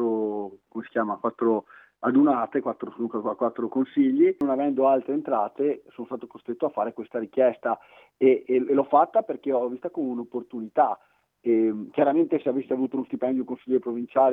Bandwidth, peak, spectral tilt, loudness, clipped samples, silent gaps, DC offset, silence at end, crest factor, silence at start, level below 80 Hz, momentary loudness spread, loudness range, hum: 3.8 kHz; -6 dBFS; -9.5 dB/octave; -25 LUFS; under 0.1%; none; under 0.1%; 0 s; 18 dB; 0 s; -74 dBFS; 12 LU; 2 LU; none